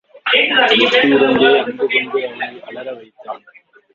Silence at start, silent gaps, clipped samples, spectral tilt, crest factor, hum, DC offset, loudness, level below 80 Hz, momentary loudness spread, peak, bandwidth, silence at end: 0.25 s; none; under 0.1%; -4.5 dB/octave; 16 dB; none; under 0.1%; -13 LUFS; -58 dBFS; 21 LU; 0 dBFS; 7.4 kHz; 0.6 s